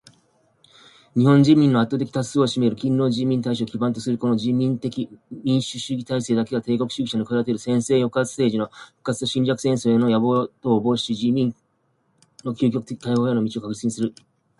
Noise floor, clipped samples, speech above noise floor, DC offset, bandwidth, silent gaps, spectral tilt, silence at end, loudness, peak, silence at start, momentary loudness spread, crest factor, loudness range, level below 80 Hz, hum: -67 dBFS; under 0.1%; 46 dB; under 0.1%; 11.5 kHz; none; -6.5 dB/octave; 0.5 s; -22 LUFS; -4 dBFS; 1.15 s; 9 LU; 18 dB; 4 LU; -60 dBFS; none